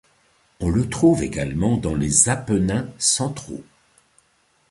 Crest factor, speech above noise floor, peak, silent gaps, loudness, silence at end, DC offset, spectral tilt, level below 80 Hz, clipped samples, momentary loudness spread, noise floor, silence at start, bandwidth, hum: 20 dB; 42 dB; -2 dBFS; none; -20 LUFS; 1.1 s; under 0.1%; -4.5 dB/octave; -40 dBFS; under 0.1%; 12 LU; -63 dBFS; 0.6 s; 11.5 kHz; none